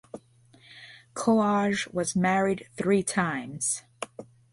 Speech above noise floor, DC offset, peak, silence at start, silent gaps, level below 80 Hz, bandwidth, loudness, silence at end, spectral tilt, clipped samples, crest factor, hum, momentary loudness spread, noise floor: 32 dB; under 0.1%; -12 dBFS; 0.15 s; none; -64 dBFS; 11.5 kHz; -26 LUFS; 0.3 s; -4.5 dB/octave; under 0.1%; 16 dB; none; 23 LU; -58 dBFS